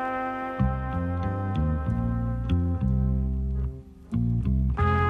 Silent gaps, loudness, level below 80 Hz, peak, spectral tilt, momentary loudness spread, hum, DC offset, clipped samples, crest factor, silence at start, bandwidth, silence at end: none; -28 LUFS; -30 dBFS; -12 dBFS; -9.5 dB/octave; 5 LU; none; under 0.1%; under 0.1%; 14 dB; 0 s; 4.4 kHz; 0 s